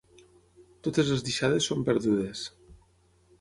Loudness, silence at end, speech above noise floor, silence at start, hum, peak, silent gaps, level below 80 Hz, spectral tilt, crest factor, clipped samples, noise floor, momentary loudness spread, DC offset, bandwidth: -28 LUFS; 0.65 s; 37 dB; 0.6 s; none; -12 dBFS; none; -58 dBFS; -5 dB/octave; 18 dB; under 0.1%; -64 dBFS; 10 LU; under 0.1%; 11.5 kHz